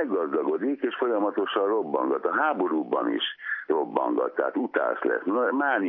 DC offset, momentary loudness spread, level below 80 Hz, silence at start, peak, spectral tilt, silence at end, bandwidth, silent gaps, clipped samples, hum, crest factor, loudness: under 0.1%; 3 LU; under -90 dBFS; 0 s; -8 dBFS; -8 dB/octave; 0 s; 3.9 kHz; none; under 0.1%; none; 18 dB; -26 LUFS